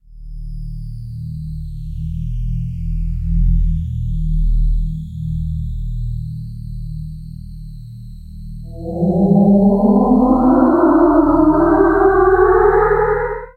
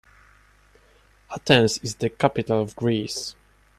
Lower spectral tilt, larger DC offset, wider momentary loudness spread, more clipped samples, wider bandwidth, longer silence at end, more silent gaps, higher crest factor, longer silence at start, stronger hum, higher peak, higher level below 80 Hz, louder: first, -11 dB/octave vs -4.5 dB/octave; neither; first, 21 LU vs 15 LU; neither; second, 4.5 kHz vs 14 kHz; second, 0.05 s vs 0.45 s; neither; second, 16 dB vs 24 dB; second, 0.1 s vs 1.3 s; second, none vs 50 Hz at -50 dBFS; about the same, 0 dBFS vs -2 dBFS; first, -22 dBFS vs -56 dBFS; first, -15 LUFS vs -23 LUFS